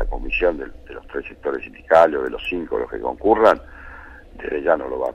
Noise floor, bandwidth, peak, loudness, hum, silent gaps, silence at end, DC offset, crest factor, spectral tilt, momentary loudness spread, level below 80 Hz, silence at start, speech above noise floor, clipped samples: -40 dBFS; 10.5 kHz; -2 dBFS; -20 LUFS; none; none; 0 s; under 0.1%; 18 dB; -6 dB/octave; 21 LU; -36 dBFS; 0 s; 20 dB; under 0.1%